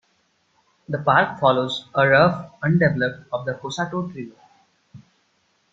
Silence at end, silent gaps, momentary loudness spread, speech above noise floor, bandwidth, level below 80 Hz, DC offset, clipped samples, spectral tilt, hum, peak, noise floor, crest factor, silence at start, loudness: 0.75 s; none; 13 LU; 45 dB; 7.8 kHz; -58 dBFS; under 0.1%; under 0.1%; -6.5 dB/octave; none; -2 dBFS; -66 dBFS; 20 dB; 0.9 s; -20 LUFS